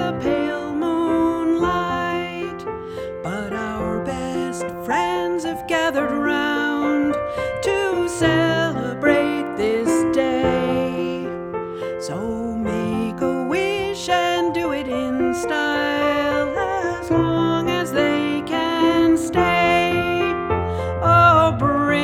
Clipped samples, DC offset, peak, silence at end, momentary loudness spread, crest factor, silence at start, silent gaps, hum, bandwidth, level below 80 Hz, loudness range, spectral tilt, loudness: under 0.1%; under 0.1%; -2 dBFS; 0 s; 9 LU; 18 dB; 0 s; none; none; 15 kHz; -44 dBFS; 5 LU; -5.5 dB/octave; -20 LUFS